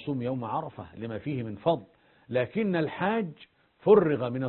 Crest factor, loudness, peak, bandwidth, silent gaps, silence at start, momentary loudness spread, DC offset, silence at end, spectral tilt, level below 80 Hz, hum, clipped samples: 22 dB; -28 LUFS; -8 dBFS; 4.3 kHz; none; 0 s; 15 LU; under 0.1%; 0 s; -11 dB/octave; -62 dBFS; none; under 0.1%